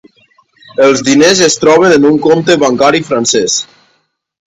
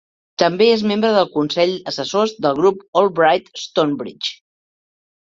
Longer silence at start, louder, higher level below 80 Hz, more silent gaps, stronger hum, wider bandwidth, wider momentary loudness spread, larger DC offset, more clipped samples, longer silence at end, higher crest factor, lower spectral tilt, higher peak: first, 0.8 s vs 0.4 s; first, -8 LUFS vs -17 LUFS; first, -50 dBFS vs -62 dBFS; second, none vs 2.88-2.93 s; neither; first, 11.5 kHz vs 7.8 kHz; about the same, 7 LU vs 9 LU; neither; first, 0.4% vs under 0.1%; about the same, 0.85 s vs 0.9 s; second, 10 dB vs 18 dB; second, -3.5 dB/octave vs -5 dB/octave; about the same, 0 dBFS vs 0 dBFS